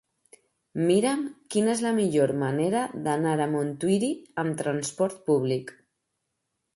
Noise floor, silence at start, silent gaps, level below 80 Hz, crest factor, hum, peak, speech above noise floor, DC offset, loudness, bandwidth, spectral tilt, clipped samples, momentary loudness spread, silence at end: -80 dBFS; 0.75 s; none; -70 dBFS; 16 dB; none; -10 dBFS; 55 dB; under 0.1%; -26 LUFS; 11.5 kHz; -5.5 dB/octave; under 0.1%; 7 LU; 1.05 s